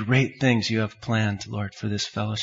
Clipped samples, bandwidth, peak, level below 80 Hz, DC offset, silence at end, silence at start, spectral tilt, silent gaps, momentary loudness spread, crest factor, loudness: under 0.1%; 7.8 kHz; -8 dBFS; -60 dBFS; under 0.1%; 0 s; 0 s; -5.5 dB/octave; none; 9 LU; 18 dB; -25 LUFS